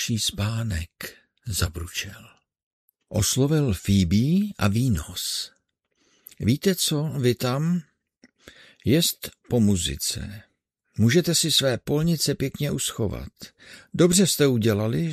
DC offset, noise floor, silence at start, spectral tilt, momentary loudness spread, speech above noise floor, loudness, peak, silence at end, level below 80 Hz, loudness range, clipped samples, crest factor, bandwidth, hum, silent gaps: under 0.1%; -71 dBFS; 0 s; -4.5 dB/octave; 16 LU; 48 dB; -23 LUFS; -6 dBFS; 0 s; -44 dBFS; 4 LU; under 0.1%; 18 dB; 14 kHz; none; 2.63-2.88 s